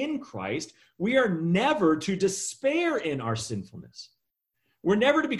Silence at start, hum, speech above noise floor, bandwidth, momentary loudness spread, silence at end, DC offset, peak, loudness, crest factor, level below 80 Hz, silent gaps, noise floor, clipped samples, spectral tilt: 0 s; none; 53 dB; 12.5 kHz; 17 LU; 0 s; under 0.1%; -8 dBFS; -26 LUFS; 18 dB; -62 dBFS; none; -80 dBFS; under 0.1%; -5 dB/octave